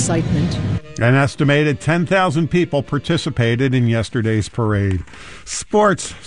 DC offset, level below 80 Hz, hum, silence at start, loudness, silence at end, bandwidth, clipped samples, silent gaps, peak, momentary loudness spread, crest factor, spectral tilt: under 0.1%; -40 dBFS; none; 0 s; -18 LUFS; 0 s; 11 kHz; under 0.1%; none; -4 dBFS; 7 LU; 14 dB; -6 dB/octave